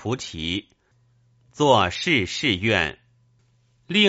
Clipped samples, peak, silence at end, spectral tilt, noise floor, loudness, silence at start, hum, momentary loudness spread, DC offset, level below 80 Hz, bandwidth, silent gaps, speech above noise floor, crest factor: under 0.1%; -4 dBFS; 0 s; -2.5 dB/octave; -62 dBFS; -22 LUFS; 0 s; none; 10 LU; under 0.1%; -52 dBFS; 8 kHz; none; 40 dB; 20 dB